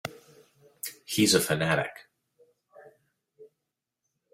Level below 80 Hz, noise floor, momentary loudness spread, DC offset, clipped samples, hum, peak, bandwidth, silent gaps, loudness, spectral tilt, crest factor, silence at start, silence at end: -66 dBFS; -85 dBFS; 17 LU; under 0.1%; under 0.1%; none; -8 dBFS; 16 kHz; none; -26 LUFS; -3.5 dB/octave; 24 dB; 0.05 s; 0.9 s